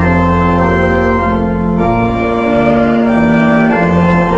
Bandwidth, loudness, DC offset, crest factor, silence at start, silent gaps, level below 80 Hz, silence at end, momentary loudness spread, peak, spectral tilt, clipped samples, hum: 7.6 kHz; -11 LUFS; under 0.1%; 10 dB; 0 s; none; -26 dBFS; 0 s; 3 LU; 0 dBFS; -8.5 dB/octave; under 0.1%; none